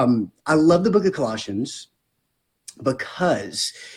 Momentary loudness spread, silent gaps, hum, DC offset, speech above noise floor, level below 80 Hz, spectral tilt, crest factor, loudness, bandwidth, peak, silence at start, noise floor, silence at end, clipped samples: 11 LU; none; none; under 0.1%; 52 dB; -58 dBFS; -5.5 dB/octave; 18 dB; -21 LUFS; 13.5 kHz; -4 dBFS; 0 s; -73 dBFS; 0 s; under 0.1%